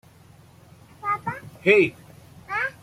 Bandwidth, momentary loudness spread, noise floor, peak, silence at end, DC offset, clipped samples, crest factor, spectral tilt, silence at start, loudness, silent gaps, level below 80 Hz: 14.5 kHz; 14 LU; -51 dBFS; -4 dBFS; 0.1 s; under 0.1%; under 0.1%; 22 dB; -6 dB/octave; 1.05 s; -23 LUFS; none; -62 dBFS